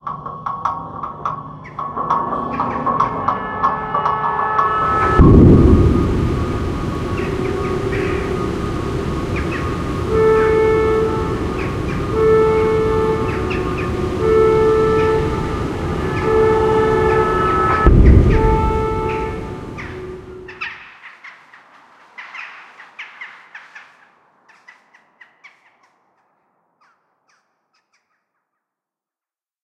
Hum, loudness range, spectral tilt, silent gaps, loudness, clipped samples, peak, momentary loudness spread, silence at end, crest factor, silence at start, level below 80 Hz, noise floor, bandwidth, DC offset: none; 20 LU; -8 dB/octave; none; -16 LUFS; under 0.1%; 0 dBFS; 19 LU; 5.8 s; 18 dB; 0.05 s; -24 dBFS; under -90 dBFS; 12 kHz; under 0.1%